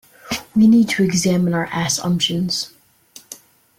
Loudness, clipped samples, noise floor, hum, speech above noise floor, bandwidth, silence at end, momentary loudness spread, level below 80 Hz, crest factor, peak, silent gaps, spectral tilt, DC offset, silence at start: -17 LUFS; under 0.1%; -47 dBFS; none; 30 dB; 16.5 kHz; 0.45 s; 24 LU; -54 dBFS; 14 dB; -6 dBFS; none; -4.5 dB/octave; under 0.1%; 0.25 s